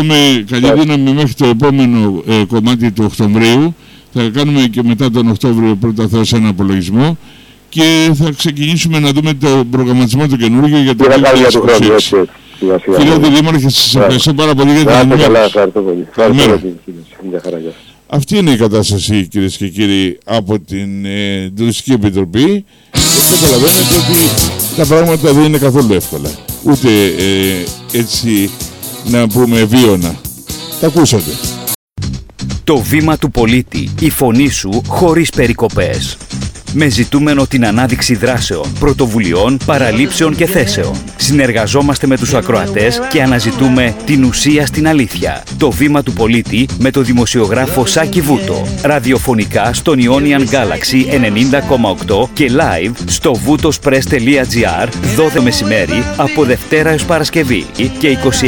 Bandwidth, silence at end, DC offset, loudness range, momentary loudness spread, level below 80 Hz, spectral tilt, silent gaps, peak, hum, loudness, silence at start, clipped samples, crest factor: 19.5 kHz; 0 s; under 0.1%; 5 LU; 10 LU; -30 dBFS; -5 dB/octave; 31.75-31.88 s; 0 dBFS; none; -10 LUFS; 0 s; under 0.1%; 10 dB